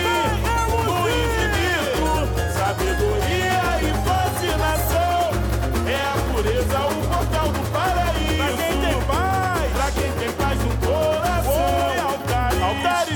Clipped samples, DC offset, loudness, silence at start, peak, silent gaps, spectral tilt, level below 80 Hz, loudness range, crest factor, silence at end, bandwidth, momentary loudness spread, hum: under 0.1%; under 0.1%; -21 LUFS; 0 s; -10 dBFS; none; -5 dB/octave; -28 dBFS; 1 LU; 12 dB; 0 s; 19 kHz; 2 LU; none